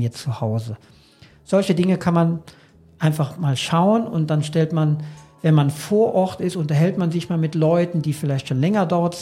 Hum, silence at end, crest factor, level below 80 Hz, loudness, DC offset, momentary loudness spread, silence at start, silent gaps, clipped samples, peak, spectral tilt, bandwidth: none; 0 s; 16 dB; -60 dBFS; -20 LUFS; under 0.1%; 7 LU; 0 s; none; under 0.1%; -4 dBFS; -7 dB/octave; 15 kHz